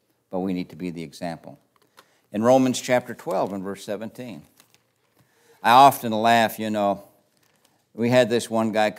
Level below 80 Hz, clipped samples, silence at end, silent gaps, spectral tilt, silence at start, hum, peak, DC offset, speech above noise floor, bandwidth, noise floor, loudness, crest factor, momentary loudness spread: -72 dBFS; under 0.1%; 0 s; none; -5 dB/octave; 0.3 s; none; -2 dBFS; under 0.1%; 43 dB; 16 kHz; -64 dBFS; -22 LUFS; 22 dB; 17 LU